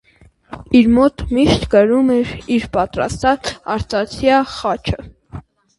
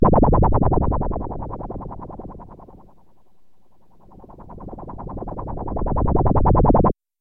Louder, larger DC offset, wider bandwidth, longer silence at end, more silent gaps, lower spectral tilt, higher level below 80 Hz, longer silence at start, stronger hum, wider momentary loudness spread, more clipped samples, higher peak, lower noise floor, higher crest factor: first, -16 LUFS vs -21 LUFS; neither; first, 11.5 kHz vs 2.5 kHz; about the same, 0.4 s vs 0.3 s; neither; second, -6 dB/octave vs -14 dB/octave; second, -36 dBFS vs -26 dBFS; first, 0.5 s vs 0 s; neither; about the same, 22 LU vs 22 LU; neither; first, 0 dBFS vs -4 dBFS; second, -36 dBFS vs -58 dBFS; about the same, 16 dB vs 18 dB